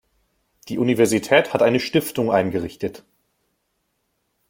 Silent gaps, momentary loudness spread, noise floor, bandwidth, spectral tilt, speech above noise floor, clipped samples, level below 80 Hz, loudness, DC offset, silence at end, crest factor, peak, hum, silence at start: none; 14 LU; -72 dBFS; 16.5 kHz; -5 dB/octave; 53 dB; under 0.1%; -58 dBFS; -20 LUFS; under 0.1%; 1.5 s; 20 dB; -2 dBFS; none; 0.65 s